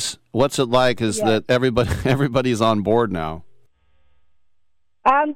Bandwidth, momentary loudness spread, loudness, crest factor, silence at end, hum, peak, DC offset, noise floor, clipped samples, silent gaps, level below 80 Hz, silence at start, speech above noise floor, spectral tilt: 16 kHz; 6 LU; -19 LUFS; 14 dB; 0 s; 60 Hz at -45 dBFS; -6 dBFS; under 0.1%; -68 dBFS; under 0.1%; none; -42 dBFS; 0 s; 50 dB; -5 dB/octave